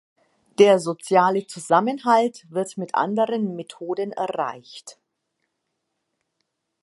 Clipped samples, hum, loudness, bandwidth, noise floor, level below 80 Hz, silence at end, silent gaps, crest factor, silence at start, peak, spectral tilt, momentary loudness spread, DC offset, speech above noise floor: under 0.1%; none; -21 LUFS; 11.5 kHz; -78 dBFS; -78 dBFS; 1.9 s; none; 20 dB; 0.6 s; -2 dBFS; -5 dB/octave; 15 LU; under 0.1%; 56 dB